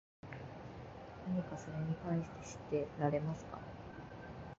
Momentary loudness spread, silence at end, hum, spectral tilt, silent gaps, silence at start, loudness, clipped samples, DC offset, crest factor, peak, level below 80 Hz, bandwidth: 14 LU; 0.05 s; none; -7.5 dB/octave; none; 0.25 s; -42 LUFS; under 0.1%; under 0.1%; 22 dB; -20 dBFS; -62 dBFS; 7.6 kHz